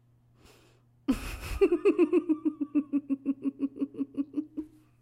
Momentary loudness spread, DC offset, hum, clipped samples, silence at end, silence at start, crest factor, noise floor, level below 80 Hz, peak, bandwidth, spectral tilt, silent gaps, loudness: 13 LU; under 0.1%; none; under 0.1%; 0.35 s; 1.1 s; 18 dB; -62 dBFS; -48 dBFS; -14 dBFS; 15.5 kHz; -6.5 dB/octave; none; -30 LUFS